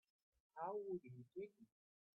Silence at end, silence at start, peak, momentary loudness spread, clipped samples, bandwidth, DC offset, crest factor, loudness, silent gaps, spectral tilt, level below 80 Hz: 0.5 s; 0.55 s; -36 dBFS; 10 LU; under 0.1%; 5.2 kHz; under 0.1%; 18 dB; -51 LUFS; none; -8.5 dB/octave; -90 dBFS